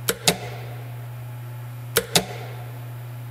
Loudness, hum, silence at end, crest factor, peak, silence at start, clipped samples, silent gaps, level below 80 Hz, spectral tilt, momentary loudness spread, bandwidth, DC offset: -27 LUFS; none; 0 s; 28 dB; 0 dBFS; 0 s; under 0.1%; none; -54 dBFS; -3 dB/octave; 15 LU; 16 kHz; under 0.1%